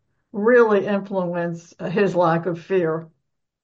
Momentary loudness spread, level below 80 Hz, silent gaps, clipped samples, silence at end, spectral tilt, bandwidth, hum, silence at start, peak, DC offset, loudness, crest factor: 14 LU; -70 dBFS; none; under 0.1%; 0.6 s; -7.5 dB/octave; 7.4 kHz; none; 0.35 s; -4 dBFS; under 0.1%; -20 LUFS; 16 dB